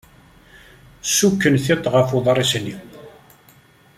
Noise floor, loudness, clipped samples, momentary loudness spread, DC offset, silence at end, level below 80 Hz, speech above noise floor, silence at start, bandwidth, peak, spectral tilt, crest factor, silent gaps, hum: -51 dBFS; -18 LUFS; under 0.1%; 13 LU; under 0.1%; 0.9 s; -52 dBFS; 34 dB; 1.05 s; 16 kHz; -2 dBFS; -4 dB/octave; 18 dB; none; none